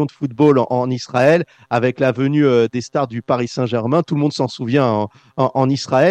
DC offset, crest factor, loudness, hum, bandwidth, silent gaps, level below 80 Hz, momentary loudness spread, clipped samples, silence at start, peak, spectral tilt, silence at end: under 0.1%; 14 dB; -17 LUFS; none; 9 kHz; none; -60 dBFS; 7 LU; under 0.1%; 0 s; -2 dBFS; -7 dB/octave; 0 s